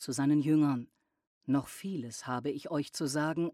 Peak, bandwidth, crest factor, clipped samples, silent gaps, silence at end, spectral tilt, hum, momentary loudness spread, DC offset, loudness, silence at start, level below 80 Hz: -18 dBFS; 14.5 kHz; 14 dB; under 0.1%; 1.27-1.41 s; 0 s; -6 dB/octave; none; 12 LU; under 0.1%; -32 LUFS; 0 s; -74 dBFS